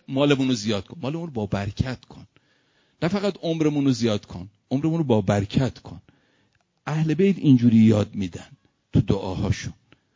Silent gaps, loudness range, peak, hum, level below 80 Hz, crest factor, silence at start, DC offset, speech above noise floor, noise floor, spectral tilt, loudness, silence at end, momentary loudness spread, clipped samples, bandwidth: none; 5 LU; -4 dBFS; none; -44 dBFS; 18 dB; 0.1 s; under 0.1%; 44 dB; -66 dBFS; -7 dB/octave; -23 LUFS; 0.45 s; 15 LU; under 0.1%; 7.6 kHz